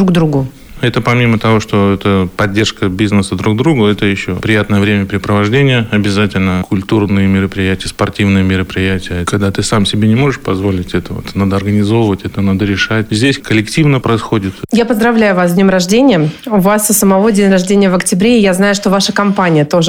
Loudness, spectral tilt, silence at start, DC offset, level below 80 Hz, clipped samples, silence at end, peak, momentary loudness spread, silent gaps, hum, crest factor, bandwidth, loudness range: -11 LUFS; -5.5 dB/octave; 0 s; under 0.1%; -36 dBFS; under 0.1%; 0 s; 0 dBFS; 6 LU; none; none; 10 dB; 17 kHz; 4 LU